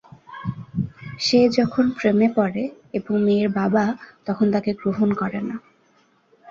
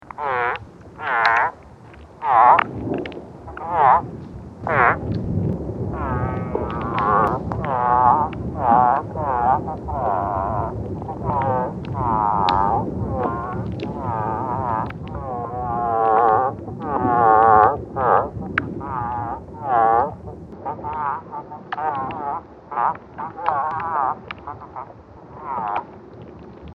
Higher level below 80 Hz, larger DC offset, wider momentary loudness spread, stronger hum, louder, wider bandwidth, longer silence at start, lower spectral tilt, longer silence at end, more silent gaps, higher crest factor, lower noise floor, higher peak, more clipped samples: second, -56 dBFS vs -40 dBFS; neither; second, 13 LU vs 17 LU; neither; about the same, -22 LUFS vs -21 LUFS; first, 7.6 kHz vs 6.8 kHz; first, 0.3 s vs 0.05 s; second, -6.5 dB/octave vs -8.5 dB/octave; about the same, 0 s vs 0 s; neither; about the same, 16 dB vs 20 dB; first, -60 dBFS vs -42 dBFS; second, -6 dBFS vs 0 dBFS; neither